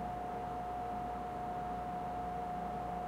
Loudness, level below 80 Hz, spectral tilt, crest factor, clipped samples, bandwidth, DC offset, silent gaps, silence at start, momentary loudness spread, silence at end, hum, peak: -41 LUFS; -54 dBFS; -7 dB/octave; 12 dB; under 0.1%; 16 kHz; under 0.1%; none; 0 s; 1 LU; 0 s; none; -30 dBFS